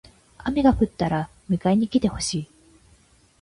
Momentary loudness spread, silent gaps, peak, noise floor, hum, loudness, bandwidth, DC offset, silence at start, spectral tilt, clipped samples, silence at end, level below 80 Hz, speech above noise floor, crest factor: 11 LU; none; -6 dBFS; -57 dBFS; none; -23 LUFS; 11.5 kHz; under 0.1%; 0.4 s; -6 dB/octave; under 0.1%; 0.95 s; -42 dBFS; 36 dB; 18 dB